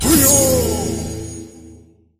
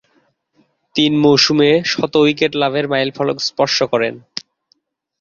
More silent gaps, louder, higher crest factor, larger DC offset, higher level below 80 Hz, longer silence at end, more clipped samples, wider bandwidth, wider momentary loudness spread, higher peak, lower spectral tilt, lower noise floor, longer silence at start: neither; about the same, -14 LUFS vs -15 LUFS; about the same, 18 dB vs 16 dB; neither; first, -32 dBFS vs -58 dBFS; second, 0.45 s vs 0.8 s; neither; first, 16 kHz vs 7.2 kHz; first, 21 LU vs 11 LU; about the same, 0 dBFS vs -2 dBFS; about the same, -3.5 dB/octave vs -4.5 dB/octave; second, -45 dBFS vs -62 dBFS; second, 0 s vs 0.95 s